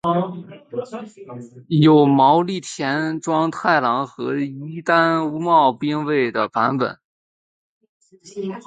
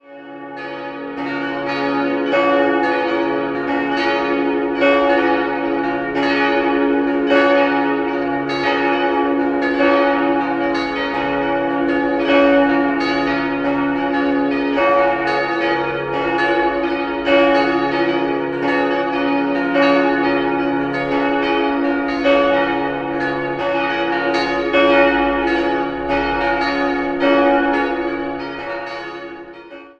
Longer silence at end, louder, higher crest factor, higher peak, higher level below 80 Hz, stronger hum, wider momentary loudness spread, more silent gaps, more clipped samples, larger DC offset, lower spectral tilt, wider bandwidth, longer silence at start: about the same, 0.05 s vs 0.1 s; about the same, -18 LUFS vs -17 LUFS; about the same, 18 dB vs 16 dB; about the same, -2 dBFS vs -2 dBFS; second, -64 dBFS vs -46 dBFS; neither; first, 19 LU vs 8 LU; first, 7.05-7.81 s, 7.89-8.01 s vs none; neither; neither; about the same, -6.5 dB/octave vs -6 dB/octave; first, 9.4 kHz vs 7.2 kHz; about the same, 0.05 s vs 0.1 s